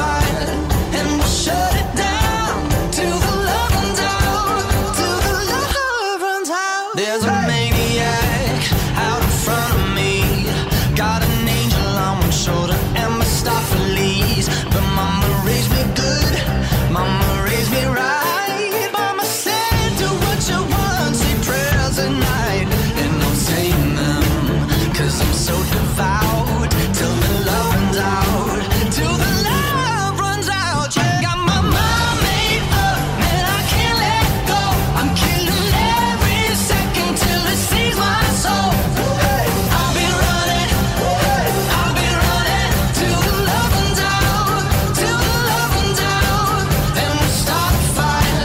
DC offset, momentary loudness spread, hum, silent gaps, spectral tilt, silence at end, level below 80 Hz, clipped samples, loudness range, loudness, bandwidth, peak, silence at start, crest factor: under 0.1%; 3 LU; none; none; -4.5 dB/octave; 0 s; -24 dBFS; under 0.1%; 2 LU; -17 LUFS; 16.5 kHz; -4 dBFS; 0 s; 12 dB